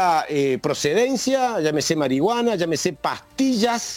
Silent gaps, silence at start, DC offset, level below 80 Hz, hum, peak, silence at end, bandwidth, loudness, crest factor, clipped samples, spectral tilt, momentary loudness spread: none; 0 s; under 0.1%; -58 dBFS; none; -6 dBFS; 0 s; 17 kHz; -21 LUFS; 16 dB; under 0.1%; -4 dB/octave; 4 LU